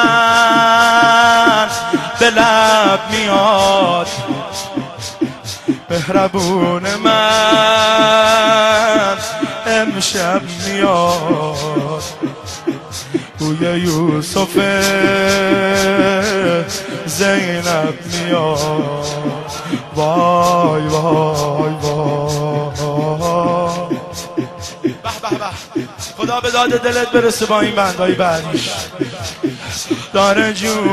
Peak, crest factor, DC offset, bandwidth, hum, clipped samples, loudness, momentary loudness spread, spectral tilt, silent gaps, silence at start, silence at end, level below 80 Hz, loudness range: 0 dBFS; 14 dB; under 0.1%; 13.5 kHz; none; under 0.1%; -14 LUFS; 13 LU; -4 dB/octave; none; 0 s; 0 s; -46 dBFS; 7 LU